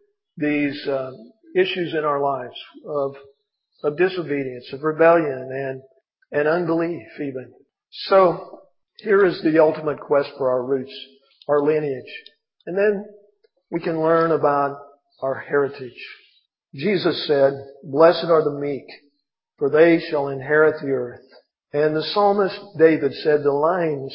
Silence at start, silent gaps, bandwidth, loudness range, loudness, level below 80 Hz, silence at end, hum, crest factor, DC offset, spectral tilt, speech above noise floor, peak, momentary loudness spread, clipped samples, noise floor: 0.35 s; none; 5.6 kHz; 5 LU; -20 LUFS; -72 dBFS; 0 s; none; 20 dB; under 0.1%; -10.5 dB/octave; 53 dB; -2 dBFS; 16 LU; under 0.1%; -73 dBFS